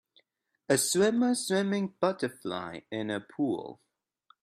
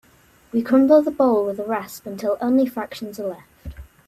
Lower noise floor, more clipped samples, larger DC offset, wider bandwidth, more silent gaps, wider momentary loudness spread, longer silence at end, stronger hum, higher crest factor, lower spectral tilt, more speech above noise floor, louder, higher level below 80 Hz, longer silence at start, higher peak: first, -73 dBFS vs -54 dBFS; neither; neither; about the same, 15 kHz vs 14.5 kHz; neither; second, 12 LU vs 21 LU; first, 0.7 s vs 0.25 s; neither; about the same, 20 dB vs 18 dB; second, -4 dB/octave vs -6.5 dB/octave; first, 43 dB vs 35 dB; second, -30 LUFS vs -20 LUFS; second, -74 dBFS vs -50 dBFS; first, 0.7 s vs 0.55 s; second, -12 dBFS vs -4 dBFS